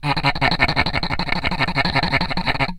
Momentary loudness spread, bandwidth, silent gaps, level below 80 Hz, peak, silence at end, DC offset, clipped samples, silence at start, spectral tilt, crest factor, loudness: 4 LU; 16 kHz; none; -30 dBFS; 0 dBFS; 0 s; under 0.1%; under 0.1%; 0 s; -5.5 dB/octave; 20 dB; -19 LUFS